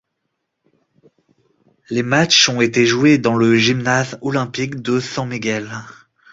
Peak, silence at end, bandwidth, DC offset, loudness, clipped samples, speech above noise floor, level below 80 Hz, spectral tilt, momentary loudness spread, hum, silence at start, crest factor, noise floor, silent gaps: 0 dBFS; 0.4 s; 7.8 kHz; under 0.1%; -16 LUFS; under 0.1%; 58 dB; -56 dBFS; -4 dB/octave; 12 LU; none; 1.9 s; 18 dB; -74 dBFS; none